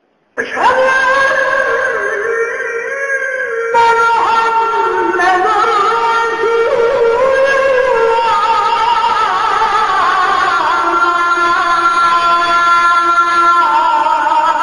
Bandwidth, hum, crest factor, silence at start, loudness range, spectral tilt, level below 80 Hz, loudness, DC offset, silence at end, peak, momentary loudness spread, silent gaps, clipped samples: 11 kHz; none; 10 dB; 0.35 s; 3 LU; -2.5 dB/octave; -48 dBFS; -11 LUFS; under 0.1%; 0 s; 0 dBFS; 6 LU; none; under 0.1%